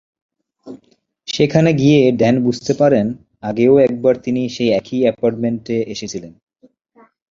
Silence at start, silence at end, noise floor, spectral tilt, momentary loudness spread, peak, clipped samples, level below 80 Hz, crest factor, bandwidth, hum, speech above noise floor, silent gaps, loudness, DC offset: 0.65 s; 1 s; -57 dBFS; -6.5 dB/octave; 14 LU; -2 dBFS; under 0.1%; -52 dBFS; 16 dB; 7.8 kHz; none; 42 dB; none; -16 LUFS; under 0.1%